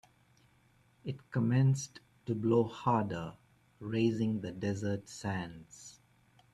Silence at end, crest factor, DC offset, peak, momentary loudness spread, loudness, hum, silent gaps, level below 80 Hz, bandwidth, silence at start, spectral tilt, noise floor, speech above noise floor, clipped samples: 0.65 s; 18 dB; under 0.1%; -16 dBFS; 18 LU; -33 LUFS; none; none; -66 dBFS; 11.5 kHz; 1.05 s; -7 dB/octave; -68 dBFS; 35 dB; under 0.1%